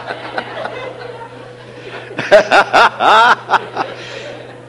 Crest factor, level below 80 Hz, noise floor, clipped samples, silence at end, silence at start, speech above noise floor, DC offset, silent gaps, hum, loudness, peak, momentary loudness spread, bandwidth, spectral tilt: 14 dB; -54 dBFS; -33 dBFS; 0.3%; 0 s; 0 s; 22 dB; under 0.1%; none; none; -12 LUFS; 0 dBFS; 22 LU; 11.5 kHz; -3 dB/octave